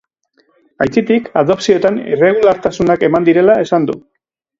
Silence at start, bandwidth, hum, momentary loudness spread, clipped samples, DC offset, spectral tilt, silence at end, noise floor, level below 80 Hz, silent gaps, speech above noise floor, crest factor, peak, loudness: 0.8 s; 7.8 kHz; none; 5 LU; under 0.1%; under 0.1%; -6.5 dB/octave; 0.6 s; -58 dBFS; -48 dBFS; none; 46 dB; 14 dB; 0 dBFS; -13 LUFS